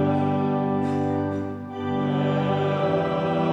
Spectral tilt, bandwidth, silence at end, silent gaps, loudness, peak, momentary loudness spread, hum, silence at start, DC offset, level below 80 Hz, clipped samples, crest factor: -8.5 dB/octave; 7.8 kHz; 0 s; none; -24 LUFS; -10 dBFS; 5 LU; 50 Hz at -50 dBFS; 0 s; under 0.1%; -60 dBFS; under 0.1%; 12 dB